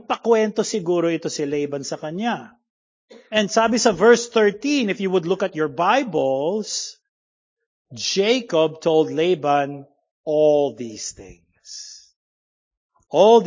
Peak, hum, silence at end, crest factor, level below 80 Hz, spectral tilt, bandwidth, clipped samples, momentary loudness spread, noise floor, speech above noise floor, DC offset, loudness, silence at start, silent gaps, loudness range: -2 dBFS; none; 0 s; 18 dB; -62 dBFS; -4 dB/octave; 7.6 kHz; under 0.1%; 14 LU; -40 dBFS; 20 dB; under 0.1%; -20 LUFS; 0.1 s; 2.70-3.08 s, 7.09-7.57 s, 7.66-7.85 s, 10.11-10.24 s, 12.16-12.71 s, 12.77-12.89 s; 5 LU